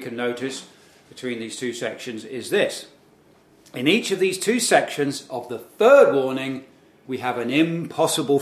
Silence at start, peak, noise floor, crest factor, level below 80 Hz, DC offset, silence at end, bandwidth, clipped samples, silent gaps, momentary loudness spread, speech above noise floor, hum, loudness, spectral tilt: 0 s; -2 dBFS; -55 dBFS; 22 dB; -72 dBFS; under 0.1%; 0 s; 15.5 kHz; under 0.1%; none; 17 LU; 33 dB; none; -21 LUFS; -4 dB/octave